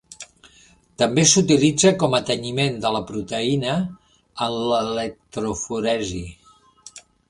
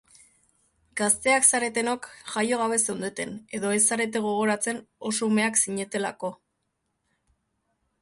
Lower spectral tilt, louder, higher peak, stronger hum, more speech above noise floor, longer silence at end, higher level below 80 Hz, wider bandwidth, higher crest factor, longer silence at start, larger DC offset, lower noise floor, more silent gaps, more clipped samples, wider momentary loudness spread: first, -4 dB/octave vs -2.5 dB/octave; first, -20 LUFS vs -24 LUFS; first, 0 dBFS vs -4 dBFS; first, 60 Hz at -45 dBFS vs none; second, 33 dB vs 52 dB; second, 0.3 s vs 1.65 s; first, -50 dBFS vs -68 dBFS; about the same, 11.5 kHz vs 12 kHz; about the same, 22 dB vs 24 dB; second, 0.1 s vs 0.95 s; neither; second, -54 dBFS vs -77 dBFS; neither; neither; first, 17 LU vs 14 LU